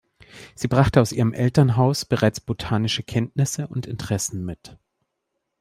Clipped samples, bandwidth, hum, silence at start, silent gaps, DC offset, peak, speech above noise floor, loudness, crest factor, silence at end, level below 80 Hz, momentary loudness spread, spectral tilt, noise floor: under 0.1%; 15.5 kHz; none; 0.35 s; none; under 0.1%; -4 dBFS; 57 dB; -22 LUFS; 20 dB; 0.85 s; -46 dBFS; 12 LU; -5.5 dB/octave; -78 dBFS